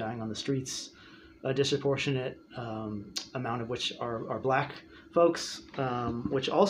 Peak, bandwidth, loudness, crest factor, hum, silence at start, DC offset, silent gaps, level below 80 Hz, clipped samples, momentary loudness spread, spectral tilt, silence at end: -10 dBFS; 15.5 kHz; -32 LUFS; 20 dB; none; 0 s; under 0.1%; none; -62 dBFS; under 0.1%; 11 LU; -5 dB/octave; 0 s